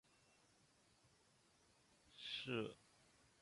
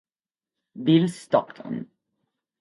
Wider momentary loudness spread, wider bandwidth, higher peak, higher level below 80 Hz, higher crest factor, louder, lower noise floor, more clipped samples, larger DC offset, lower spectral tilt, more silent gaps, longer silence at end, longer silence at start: first, 21 LU vs 14 LU; about the same, 11.5 kHz vs 11.5 kHz; second, -30 dBFS vs -6 dBFS; second, -84 dBFS vs -72 dBFS; about the same, 24 dB vs 20 dB; second, -48 LUFS vs -24 LUFS; second, -76 dBFS vs under -90 dBFS; neither; neither; second, -4.5 dB/octave vs -7 dB/octave; neither; second, 0.6 s vs 0.75 s; first, 1.05 s vs 0.75 s